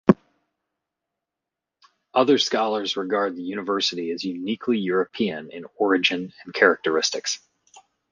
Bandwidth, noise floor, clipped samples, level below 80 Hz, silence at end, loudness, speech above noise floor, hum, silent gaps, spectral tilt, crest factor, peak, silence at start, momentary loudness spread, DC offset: 9.8 kHz; -86 dBFS; under 0.1%; -62 dBFS; 0.35 s; -23 LUFS; 63 dB; none; none; -4 dB/octave; 22 dB; -2 dBFS; 0.05 s; 10 LU; under 0.1%